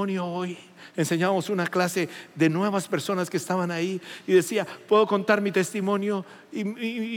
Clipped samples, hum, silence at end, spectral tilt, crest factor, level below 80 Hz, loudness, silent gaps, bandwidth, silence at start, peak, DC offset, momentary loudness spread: under 0.1%; none; 0 s; -5.5 dB/octave; 18 dB; -84 dBFS; -25 LUFS; none; 17 kHz; 0 s; -6 dBFS; under 0.1%; 10 LU